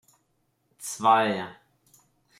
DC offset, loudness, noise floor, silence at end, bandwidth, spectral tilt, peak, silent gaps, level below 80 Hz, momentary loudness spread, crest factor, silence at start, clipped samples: under 0.1%; -24 LUFS; -72 dBFS; 0.85 s; 16 kHz; -3.5 dB/octave; -6 dBFS; none; -78 dBFS; 18 LU; 22 dB; 0.8 s; under 0.1%